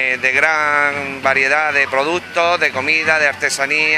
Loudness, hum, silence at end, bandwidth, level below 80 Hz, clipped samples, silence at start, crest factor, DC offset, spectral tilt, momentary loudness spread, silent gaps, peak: -14 LUFS; none; 0 s; 14.5 kHz; -62 dBFS; under 0.1%; 0 s; 16 dB; under 0.1%; -2 dB/octave; 5 LU; none; 0 dBFS